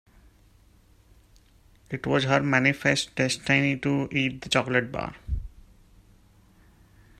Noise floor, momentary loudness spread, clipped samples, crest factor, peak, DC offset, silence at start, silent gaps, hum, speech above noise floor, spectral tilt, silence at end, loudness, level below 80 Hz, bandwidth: -58 dBFS; 13 LU; under 0.1%; 22 dB; -6 dBFS; under 0.1%; 1.9 s; none; none; 33 dB; -5 dB/octave; 1.7 s; -25 LUFS; -46 dBFS; 13.5 kHz